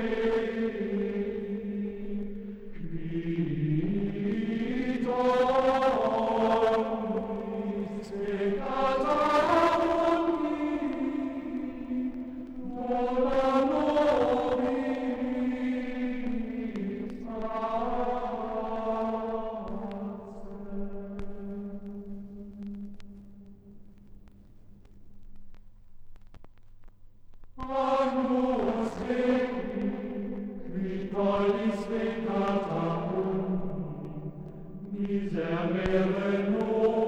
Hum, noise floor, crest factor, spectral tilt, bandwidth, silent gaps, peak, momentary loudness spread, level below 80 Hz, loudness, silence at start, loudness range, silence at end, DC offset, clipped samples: none; -51 dBFS; 18 dB; -7.5 dB/octave; 10.5 kHz; none; -12 dBFS; 15 LU; -48 dBFS; -30 LUFS; 0 s; 13 LU; 0 s; under 0.1%; under 0.1%